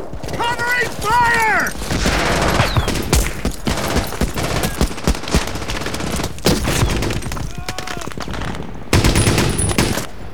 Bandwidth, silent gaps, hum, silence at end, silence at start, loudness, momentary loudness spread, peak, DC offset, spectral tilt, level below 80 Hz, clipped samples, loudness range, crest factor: over 20 kHz; none; none; 0 s; 0 s; -18 LUFS; 12 LU; 0 dBFS; 4%; -4 dB/octave; -26 dBFS; under 0.1%; 4 LU; 18 dB